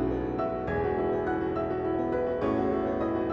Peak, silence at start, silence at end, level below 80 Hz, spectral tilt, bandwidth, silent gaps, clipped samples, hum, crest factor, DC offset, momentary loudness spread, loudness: -16 dBFS; 0 s; 0 s; -46 dBFS; -9.5 dB/octave; 6.4 kHz; none; under 0.1%; none; 12 dB; under 0.1%; 2 LU; -29 LUFS